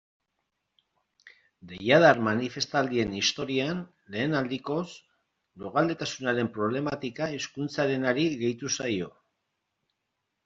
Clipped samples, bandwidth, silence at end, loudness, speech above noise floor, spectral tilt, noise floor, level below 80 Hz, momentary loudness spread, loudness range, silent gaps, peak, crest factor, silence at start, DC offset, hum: under 0.1%; 7.8 kHz; 1.35 s; -27 LUFS; 54 dB; -4.5 dB/octave; -81 dBFS; -64 dBFS; 11 LU; 5 LU; none; -4 dBFS; 24 dB; 1.25 s; under 0.1%; none